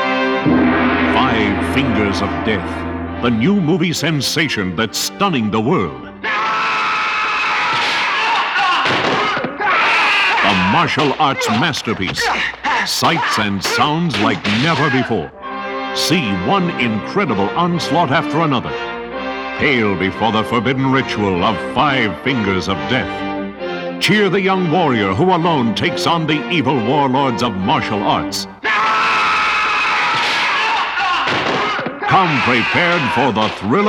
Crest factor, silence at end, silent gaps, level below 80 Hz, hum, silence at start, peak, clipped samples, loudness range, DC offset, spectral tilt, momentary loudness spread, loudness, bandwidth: 14 dB; 0 s; none; -44 dBFS; none; 0 s; -2 dBFS; under 0.1%; 3 LU; under 0.1%; -4.5 dB/octave; 6 LU; -15 LUFS; 19 kHz